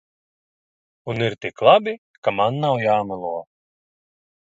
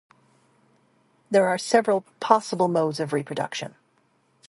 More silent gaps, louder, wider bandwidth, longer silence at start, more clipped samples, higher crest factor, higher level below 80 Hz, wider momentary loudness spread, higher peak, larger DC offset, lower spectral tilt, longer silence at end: first, 1.98-2.22 s vs none; first, -20 LUFS vs -23 LUFS; second, 7.8 kHz vs 11.5 kHz; second, 1.05 s vs 1.3 s; neither; about the same, 22 dB vs 24 dB; first, -62 dBFS vs -74 dBFS; first, 15 LU vs 9 LU; about the same, 0 dBFS vs 0 dBFS; neither; first, -6.5 dB/octave vs -5 dB/octave; first, 1.15 s vs 0.8 s